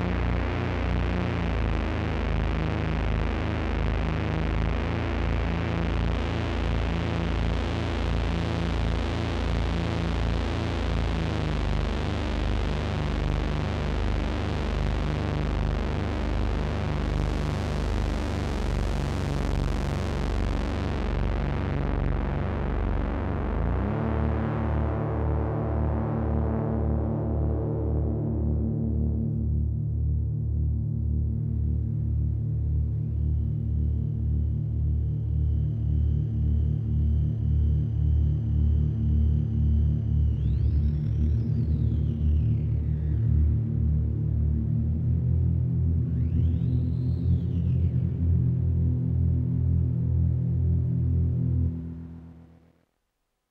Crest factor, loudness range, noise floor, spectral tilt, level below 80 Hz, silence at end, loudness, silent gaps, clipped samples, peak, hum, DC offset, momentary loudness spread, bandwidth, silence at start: 12 dB; 3 LU; -78 dBFS; -8 dB/octave; -30 dBFS; 1.1 s; -27 LUFS; none; under 0.1%; -12 dBFS; none; under 0.1%; 4 LU; 8 kHz; 0 s